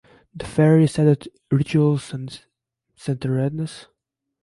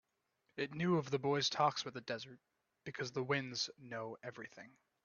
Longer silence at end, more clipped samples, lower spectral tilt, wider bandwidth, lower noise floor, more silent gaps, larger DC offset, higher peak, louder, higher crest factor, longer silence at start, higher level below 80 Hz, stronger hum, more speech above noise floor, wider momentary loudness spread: first, 0.6 s vs 0.35 s; neither; first, -8 dB/octave vs -3.5 dB/octave; first, 11.5 kHz vs 7.2 kHz; about the same, -81 dBFS vs -82 dBFS; neither; neither; first, -4 dBFS vs -20 dBFS; first, -20 LUFS vs -39 LUFS; second, 16 dB vs 22 dB; second, 0.35 s vs 0.55 s; first, -54 dBFS vs -80 dBFS; neither; first, 61 dB vs 43 dB; about the same, 19 LU vs 18 LU